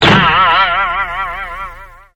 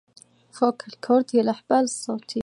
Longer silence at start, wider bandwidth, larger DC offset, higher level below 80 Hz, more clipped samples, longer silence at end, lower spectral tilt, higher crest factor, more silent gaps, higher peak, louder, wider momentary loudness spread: second, 0 s vs 0.55 s; first, 15 kHz vs 11.5 kHz; neither; first, -34 dBFS vs -66 dBFS; first, 0.1% vs under 0.1%; first, 0.25 s vs 0 s; about the same, -5 dB/octave vs -4.5 dB/octave; about the same, 14 dB vs 18 dB; neither; first, 0 dBFS vs -6 dBFS; first, -11 LUFS vs -23 LUFS; first, 17 LU vs 9 LU